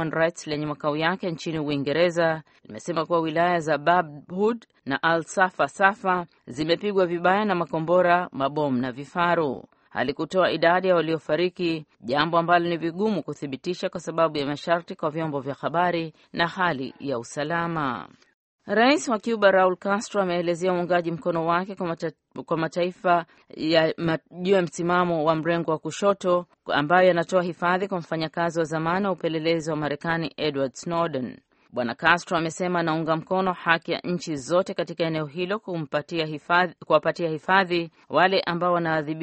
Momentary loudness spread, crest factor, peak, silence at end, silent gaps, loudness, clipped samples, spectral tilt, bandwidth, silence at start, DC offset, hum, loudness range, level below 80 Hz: 9 LU; 22 dB; -2 dBFS; 0 s; 18.34-18.59 s; -24 LUFS; under 0.1%; -5.5 dB/octave; 8.4 kHz; 0 s; under 0.1%; none; 3 LU; -64 dBFS